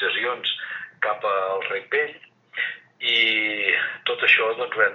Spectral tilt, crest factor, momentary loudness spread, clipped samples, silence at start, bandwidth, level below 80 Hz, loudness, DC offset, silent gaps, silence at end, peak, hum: -3 dB/octave; 22 dB; 11 LU; under 0.1%; 0 s; 7.2 kHz; under -90 dBFS; -22 LUFS; under 0.1%; none; 0 s; -2 dBFS; none